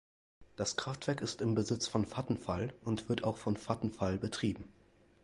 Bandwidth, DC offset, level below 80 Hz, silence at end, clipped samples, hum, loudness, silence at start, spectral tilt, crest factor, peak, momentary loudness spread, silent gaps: 11.5 kHz; under 0.1%; -58 dBFS; 0.5 s; under 0.1%; none; -36 LUFS; 0.4 s; -5 dB/octave; 20 dB; -16 dBFS; 5 LU; none